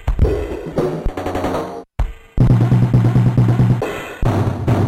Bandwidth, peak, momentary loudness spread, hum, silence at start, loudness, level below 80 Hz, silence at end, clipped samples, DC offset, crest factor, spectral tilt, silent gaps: 9.4 kHz; -2 dBFS; 12 LU; none; 0 s; -17 LUFS; -24 dBFS; 0 s; under 0.1%; under 0.1%; 12 dB; -8.5 dB/octave; none